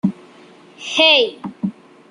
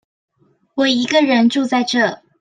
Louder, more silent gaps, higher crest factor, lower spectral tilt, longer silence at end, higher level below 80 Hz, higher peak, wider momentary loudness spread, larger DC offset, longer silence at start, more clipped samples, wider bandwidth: about the same, -16 LUFS vs -16 LUFS; neither; about the same, 18 dB vs 16 dB; about the same, -4 dB/octave vs -3.5 dB/octave; first, 0.4 s vs 0.25 s; about the same, -66 dBFS vs -66 dBFS; about the same, 0 dBFS vs -2 dBFS; first, 16 LU vs 6 LU; neither; second, 0.05 s vs 0.75 s; neither; first, 11 kHz vs 9.4 kHz